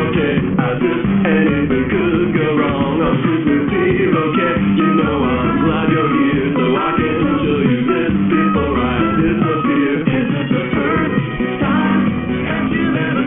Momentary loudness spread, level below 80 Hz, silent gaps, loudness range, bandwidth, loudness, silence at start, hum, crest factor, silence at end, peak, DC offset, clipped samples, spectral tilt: 3 LU; -36 dBFS; none; 1 LU; 3.8 kHz; -15 LUFS; 0 s; none; 12 dB; 0 s; -2 dBFS; under 0.1%; under 0.1%; -4.5 dB/octave